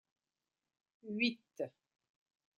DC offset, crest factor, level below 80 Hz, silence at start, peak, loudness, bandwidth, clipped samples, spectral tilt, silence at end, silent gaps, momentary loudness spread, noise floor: under 0.1%; 24 dB; -90 dBFS; 1.05 s; -22 dBFS; -39 LUFS; 7 kHz; under 0.1%; -5 dB/octave; 0.9 s; none; 11 LU; under -90 dBFS